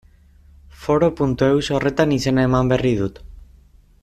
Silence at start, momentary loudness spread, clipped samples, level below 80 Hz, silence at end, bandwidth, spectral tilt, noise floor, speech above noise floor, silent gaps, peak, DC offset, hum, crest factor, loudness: 0.8 s; 5 LU; under 0.1%; -40 dBFS; 0.65 s; 13.5 kHz; -6.5 dB/octave; -50 dBFS; 32 dB; none; -4 dBFS; under 0.1%; none; 16 dB; -19 LUFS